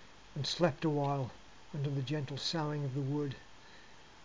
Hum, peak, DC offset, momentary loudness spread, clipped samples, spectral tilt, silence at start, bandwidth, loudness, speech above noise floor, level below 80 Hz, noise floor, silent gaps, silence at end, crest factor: none; -16 dBFS; 0.2%; 23 LU; under 0.1%; -6 dB/octave; 0 s; 7.6 kHz; -36 LUFS; 22 dB; -66 dBFS; -57 dBFS; none; 0.05 s; 22 dB